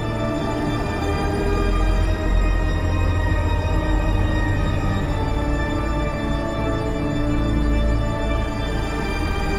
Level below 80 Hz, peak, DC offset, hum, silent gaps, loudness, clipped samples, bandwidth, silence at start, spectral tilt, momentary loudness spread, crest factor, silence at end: -24 dBFS; -8 dBFS; 0.3%; none; none; -22 LUFS; under 0.1%; 12 kHz; 0 s; -7 dB/octave; 3 LU; 12 dB; 0 s